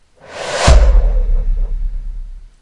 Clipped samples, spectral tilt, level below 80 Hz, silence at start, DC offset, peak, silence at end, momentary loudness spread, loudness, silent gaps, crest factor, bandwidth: under 0.1%; -4.5 dB/octave; -14 dBFS; 0.3 s; under 0.1%; 0 dBFS; 0.15 s; 21 LU; -16 LUFS; none; 14 dB; 11 kHz